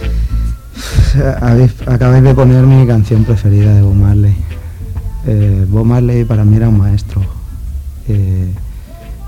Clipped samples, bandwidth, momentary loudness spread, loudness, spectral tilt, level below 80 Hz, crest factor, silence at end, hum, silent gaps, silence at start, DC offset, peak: under 0.1%; 10.5 kHz; 17 LU; -10 LUFS; -8.5 dB/octave; -20 dBFS; 10 dB; 0 s; none; none; 0 s; under 0.1%; 0 dBFS